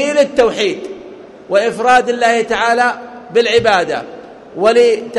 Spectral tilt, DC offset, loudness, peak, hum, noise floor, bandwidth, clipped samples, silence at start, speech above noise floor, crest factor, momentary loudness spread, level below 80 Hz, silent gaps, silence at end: -3.5 dB/octave; under 0.1%; -13 LUFS; 0 dBFS; none; -34 dBFS; 11.5 kHz; under 0.1%; 0 s; 22 dB; 12 dB; 16 LU; -50 dBFS; none; 0 s